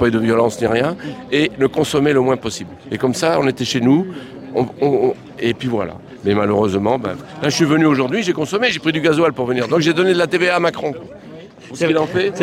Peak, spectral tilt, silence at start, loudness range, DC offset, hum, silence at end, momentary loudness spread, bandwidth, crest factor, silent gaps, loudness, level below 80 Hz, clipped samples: -4 dBFS; -5.5 dB/octave; 0 s; 3 LU; under 0.1%; none; 0 s; 12 LU; 16 kHz; 14 dB; none; -17 LUFS; -52 dBFS; under 0.1%